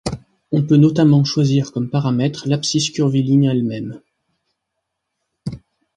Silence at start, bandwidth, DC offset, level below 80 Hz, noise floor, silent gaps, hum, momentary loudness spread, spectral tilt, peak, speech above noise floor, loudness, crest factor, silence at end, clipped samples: 0.05 s; 10.5 kHz; under 0.1%; -50 dBFS; -77 dBFS; none; none; 18 LU; -6.5 dB/octave; -2 dBFS; 61 dB; -16 LUFS; 16 dB; 0.4 s; under 0.1%